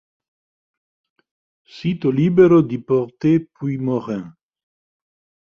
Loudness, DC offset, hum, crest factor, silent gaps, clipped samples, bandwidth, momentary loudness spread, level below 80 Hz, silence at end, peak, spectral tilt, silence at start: -18 LUFS; under 0.1%; none; 18 dB; none; under 0.1%; 6.8 kHz; 14 LU; -58 dBFS; 1.2 s; -2 dBFS; -9.5 dB/octave; 1.75 s